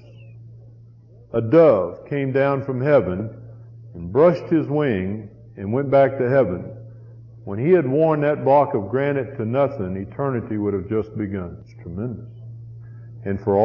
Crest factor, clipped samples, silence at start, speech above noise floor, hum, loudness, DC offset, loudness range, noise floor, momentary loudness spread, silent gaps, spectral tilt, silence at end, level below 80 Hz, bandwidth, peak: 18 dB; under 0.1%; 0.1 s; 27 dB; none; -20 LUFS; under 0.1%; 6 LU; -46 dBFS; 22 LU; none; -10.5 dB/octave; 0 s; -56 dBFS; 6 kHz; -4 dBFS